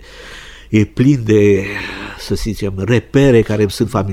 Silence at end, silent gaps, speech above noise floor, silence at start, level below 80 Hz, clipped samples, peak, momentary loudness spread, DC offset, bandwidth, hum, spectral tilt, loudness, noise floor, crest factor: 0 s; none; 21 dB; 0 s; -34 dBFS; under 0.1%; 0 dBFS; 17 LU; under 0.1%; 15.5 kHz; none; -7 dB/octave; -14 LUFS; -34 dBFS; 14 dB